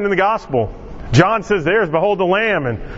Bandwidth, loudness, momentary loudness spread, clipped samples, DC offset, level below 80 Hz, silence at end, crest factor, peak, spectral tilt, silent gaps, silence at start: 7.8 kHz; -16 LUFS; 7 LU; under 0.1%; under 0.1%; -36 dBFS; 0 s; 16 dB; 0 dBFS; -6.5 dB/octave; none; 0 s